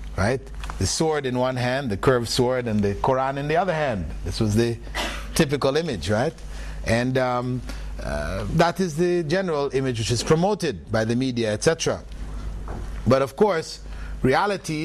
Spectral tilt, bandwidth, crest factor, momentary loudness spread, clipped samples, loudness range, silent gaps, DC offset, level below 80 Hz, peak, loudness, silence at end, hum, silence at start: -5 dB/octave; 13 kHz; 16 dB; 12 LU; under 0.1%; 2 LU; none; under 0.1%; -36 dBFS; -6 dBFS; -23 LUFS; 0 s; none; 0 s